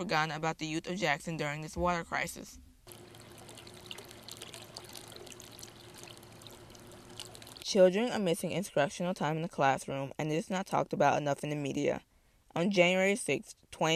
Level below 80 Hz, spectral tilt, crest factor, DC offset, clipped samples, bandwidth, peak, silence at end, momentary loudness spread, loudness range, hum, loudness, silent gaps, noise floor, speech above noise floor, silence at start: -62 dBFS; -4.5 dB/octave; 22 dB; under 0.1%; under 0.1%; 15 kHz; -12 dBFS; 0 s; 23 LU; 16 LU; none; -32 LUFS; none; -53 dBFS; 22 dB; 0 s